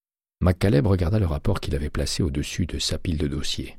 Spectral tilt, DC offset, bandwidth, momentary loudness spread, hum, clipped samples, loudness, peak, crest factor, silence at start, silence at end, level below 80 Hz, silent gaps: -5.5 dB/octave; under 0.1%; 15 kHz; 7 LU; none; under 0.1%; -24 LUFS; -6 dBFS; 16 dB; 0.4 s; 0 s; -32 dBFS; none